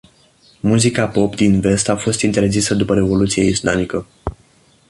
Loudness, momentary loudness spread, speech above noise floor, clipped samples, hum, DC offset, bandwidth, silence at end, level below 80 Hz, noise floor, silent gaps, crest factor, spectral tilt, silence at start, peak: -16 LUFS; 9 LU; 37 dB; under 0.1%; none; under 0.1%; 11.5 kHz; 0.55 s; -38 dBFS; -52 dBFS; none; 16 dB; -5 dB/octave; 0.65 s; -2 dBFS